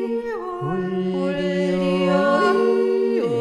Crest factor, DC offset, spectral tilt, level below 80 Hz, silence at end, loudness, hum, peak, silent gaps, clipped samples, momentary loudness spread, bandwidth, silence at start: 14 dB; under 0.1%; -7 dB/octave; -54 dBFS; 0 s; -21 LUFS; none; -6 dBFS; none; under 0.1%; 9 LU; 11 kHz; 0 s